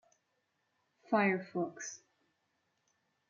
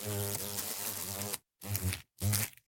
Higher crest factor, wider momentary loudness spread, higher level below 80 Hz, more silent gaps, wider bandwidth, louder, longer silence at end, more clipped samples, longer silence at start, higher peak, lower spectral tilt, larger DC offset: second, 22 dB vs 28 dB; first, 15 LU vs 6 LU; second, -90 dBFS vs -58 dBFS; neither; second, 7.4 kHz vs 17 kHz; about the same, -34 LUFS vs -36 LUFS; first, 1.35 s vs 0.15 s; neither; first, 1.1 s vs 0 s; second, -16 dBFS vs -10 dBFS; first, -5.5 dB/octave vs -3 dB/octave; neither